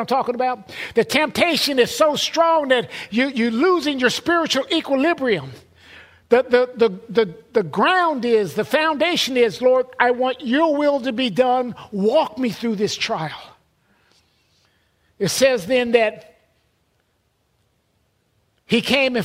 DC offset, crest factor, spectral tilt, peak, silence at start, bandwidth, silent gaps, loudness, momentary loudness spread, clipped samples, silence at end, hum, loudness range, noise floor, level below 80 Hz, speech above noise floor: under 0.1%; 20 dB; -4 dB/octave; 0 dBFS; 0 s; 16 kHz; none; -19 LUFS; 7 LU; under 0.1%; 0 s; none; 6 LU; -66 dBFS; -60 dBFS; 48 dB